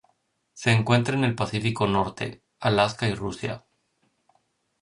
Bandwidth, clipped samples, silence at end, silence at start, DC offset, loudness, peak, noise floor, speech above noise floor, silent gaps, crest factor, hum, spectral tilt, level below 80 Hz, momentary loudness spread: 11 kHz; under 0.1%; 1.25 s; 0.55 s; under 0.1%; -25 LUFS; -8 dBFS; -71 dBFS; 47 dB; none; 18 dB; none; -6 dB/octave; -54 dBFS; 12 LU